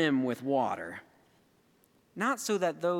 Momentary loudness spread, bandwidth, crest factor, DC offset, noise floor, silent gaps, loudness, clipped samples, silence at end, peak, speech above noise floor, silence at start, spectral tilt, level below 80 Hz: 15 LU; 17 kHz; 18 dB; under 0.1%; -67 dBFS; none; -31 LUFS; under 0.1%; 0 s; -14 dBFS; 37 dB; 0 s; -4.5 dB/octave; -82 dBFS